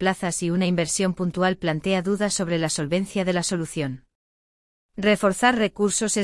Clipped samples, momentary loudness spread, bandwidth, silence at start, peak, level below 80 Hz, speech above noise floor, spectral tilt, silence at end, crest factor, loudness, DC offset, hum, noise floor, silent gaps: under 0.1%; 7 LU; 12 kHz; 0 s; -6 dBFS; -54 dBFS; over 67 dB; -4.5 dB/octave; 0 s; 18 dB; -23 LUFS; under 0.1%; none; under -90 dBFS; 4.15-4.89 s